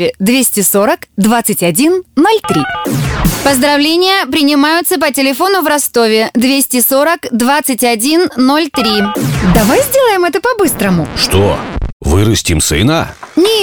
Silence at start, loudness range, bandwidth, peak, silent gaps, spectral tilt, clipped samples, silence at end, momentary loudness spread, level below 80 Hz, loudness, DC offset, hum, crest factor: 0 s; 1 LU; over 20 kHz; 0 dBFS; 11.93-12.00 s; -4 dB/octave; under 0.1%; 0 s; 5 LU; -28 dBFS; -10 LUFS; under 0.1%; none; 10 dB